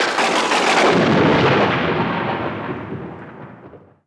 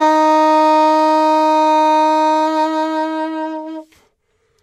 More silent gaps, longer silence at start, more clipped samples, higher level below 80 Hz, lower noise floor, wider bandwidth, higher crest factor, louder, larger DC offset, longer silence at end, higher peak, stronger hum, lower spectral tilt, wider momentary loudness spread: neither; about the same, 0 s vs 0 s; neither; first, -50 dBFS vs -72 dBFS; second, -43 dBFS vs -63 dBFS; second, 11 kHz vs 13.5 kHz; about the same, 14 dB vs 10 dB; about the same, -16 LUFS vs -14 LUFS; neither; second, 0.3 s vs 0.8 s; about the same, -4 dBFS vs -4 dBFS; neither; first, -4.5 dB/octave vs -2 dB/octave; first, 17 LU vs 12 LU